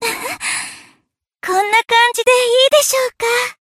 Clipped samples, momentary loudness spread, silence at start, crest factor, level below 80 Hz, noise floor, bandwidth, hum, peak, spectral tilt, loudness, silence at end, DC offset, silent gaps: under 0.1%; 10 LU; 0 s; 16 dB; -60 dBFS; -64 dBFS; 16 kHz; none; 0 dBFS; 0.5 dB/octave; -14 LUFS; 0.25 s; under 0.1%; none